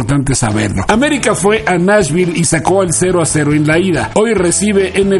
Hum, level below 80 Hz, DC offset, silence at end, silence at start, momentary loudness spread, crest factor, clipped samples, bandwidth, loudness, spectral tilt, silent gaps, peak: none; -34 dBFS; under 0.1%; 0 s; 0 s; 3 LU; 12 dB; under 0.1%; 12 kHz; -12 LUFS; -4.5 dB/octave; none; 0 dBFS